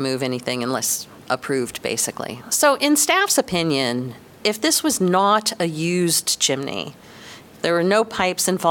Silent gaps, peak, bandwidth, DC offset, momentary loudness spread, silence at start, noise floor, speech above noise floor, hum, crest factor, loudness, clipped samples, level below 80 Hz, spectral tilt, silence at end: none; -4 dBFS; 18 kHz; under 0.1%; 11 LU; 0 s; -42 dBFS; 21 dB; none; 16 dB; -20 LUFS; under 0.1%; -60 dBFS; -3 dB/octave; 0 s